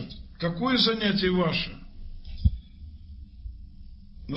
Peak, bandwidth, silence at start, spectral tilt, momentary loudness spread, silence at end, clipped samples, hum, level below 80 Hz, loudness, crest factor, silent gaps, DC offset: -8 dBFS; 8.2 kHz; 0 s; -7.5 dB/octave; 25 LU; 0 s; under 0.1%; none; -36 dBFS; -26 LUFS; 20 dB; none; under 0.1%